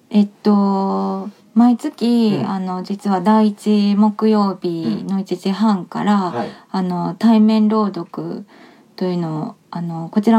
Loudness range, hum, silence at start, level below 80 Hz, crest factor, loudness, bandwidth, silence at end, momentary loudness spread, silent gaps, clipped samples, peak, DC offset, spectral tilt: 2 LU; none; 0.1 s; -72 dBFS; 14 dB; -18 LUFS; 11 kHz; 0 s; 12 LU; none; under 0.1%; -2 dBFS; under 0.1%; -8 dB/octave